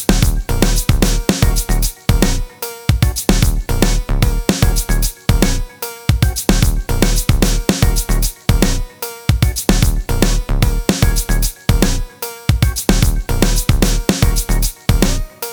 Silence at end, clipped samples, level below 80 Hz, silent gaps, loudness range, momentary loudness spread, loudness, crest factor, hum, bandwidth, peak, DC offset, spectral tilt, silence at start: 0 s; under 0.1%; -16 dBFS; none; 1 LU; 4 LU; -16 LUFS; 14 dB; none; over 20 kHz; 0 dBFS; under 0.1%; -4.5 dB/octave; 0 s